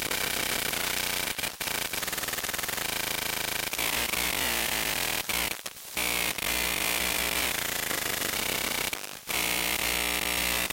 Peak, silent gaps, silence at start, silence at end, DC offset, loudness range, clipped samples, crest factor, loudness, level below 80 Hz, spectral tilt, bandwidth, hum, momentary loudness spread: -10 dBFS; none; 0 s; 0 s; under 0.1%; 2 LU; under 0.1%; 20 dB; -27 LUFS; -50 dBFS; -0.5 dB/octave; 17 kHz; none; 4 LU